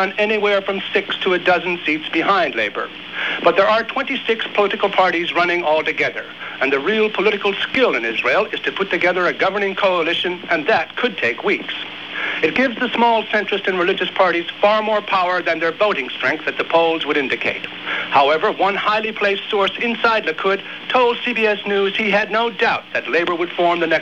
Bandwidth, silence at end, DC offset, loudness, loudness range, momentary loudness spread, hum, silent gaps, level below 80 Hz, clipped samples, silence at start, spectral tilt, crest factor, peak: 8.2 kHz; 0 s; 0.2%; -18 LUFS; 1 LU; 5 LU; none; none; -62 dBFS; under 0.1%; 0 s; -5 dB/octave; 16 dB; -2 dBFS